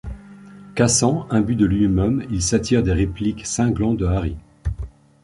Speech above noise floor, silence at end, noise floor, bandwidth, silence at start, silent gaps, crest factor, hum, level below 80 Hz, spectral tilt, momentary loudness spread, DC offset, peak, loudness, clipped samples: 23 dB; 0.35 s; -41 dBFS; 11.5 kHz; 0.05 s; none; 18 dB; none; -32 dBFS; -5.5 dB/octave; 13 LU; under 0.1%; -2 dBFS; -20 LUFS; under 0.1%